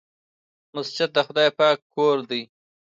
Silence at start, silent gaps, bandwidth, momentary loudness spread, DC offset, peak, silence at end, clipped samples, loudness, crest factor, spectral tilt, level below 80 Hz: 0.75 s; 1.82-1.90 s; 7.8 kHz; 12 LU; under 0.1%; -6 dBFS; 0.45 s; under 0.1%; -22 LUFS; 18 dB; -4.5 dB/octave; -78 dBFS